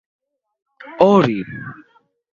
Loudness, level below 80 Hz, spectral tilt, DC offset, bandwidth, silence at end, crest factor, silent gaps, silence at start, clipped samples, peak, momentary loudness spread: -15 LUFS; -58 dBFS; -8 dB/octave; under 0.1%; 7.2 kHz; 0.6 s; 20 dB; none; 0.85 s; under 0.1%; 0 dBFS; 23 LU